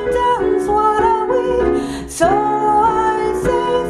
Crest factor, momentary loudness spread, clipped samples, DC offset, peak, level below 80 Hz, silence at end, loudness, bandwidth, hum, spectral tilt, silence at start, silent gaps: 14 dB; 4 LU; under 0.1%; under 0.1%; 0 dBFS; -36 dBFS; 0 s; -16 LUFS; 13 kHz; none; -5.5 dB/octave; 0 s; none